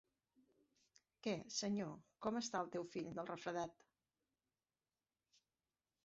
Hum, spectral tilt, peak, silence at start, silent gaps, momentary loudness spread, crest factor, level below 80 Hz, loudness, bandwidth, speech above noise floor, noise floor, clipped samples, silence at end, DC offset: none; -4 dB/octave; -28 dBFS; 1.25 s; none; 6 LU; 22 dB; -82 dBFS; -45 LUFS; 7.6 kHz; over 45 dB; under -90 dBFS; under 0.1%; 2.3 s; under 0.1%